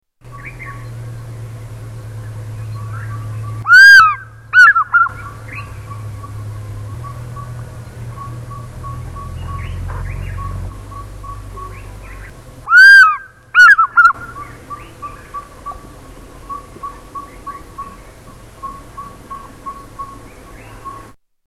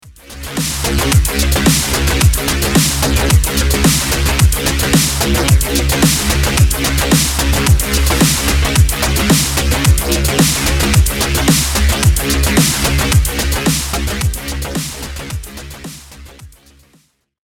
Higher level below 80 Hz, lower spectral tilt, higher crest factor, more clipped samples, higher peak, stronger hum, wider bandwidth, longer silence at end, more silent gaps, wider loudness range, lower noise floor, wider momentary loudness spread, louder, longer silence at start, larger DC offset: second, -36 dBFS vs -18 dBFS; about the same, -3 dB/octave vs -3.5 dB/octave; about the same, 16 dB vs 14 dB; neither; about the same, 0 dBFS vs 0 dBFS; neither; second, 17 kHz vs 19 kHz; second, 0.5 s vs 1.05 s; neither; first, 23 LU vs 6 LU; second, -39 dBFS vs -54 dBFS; first, 26 LU vs 9 LU; first, -7 LUFS vs -13 LUFS; first, 0.35 s vs 0.05 s; neither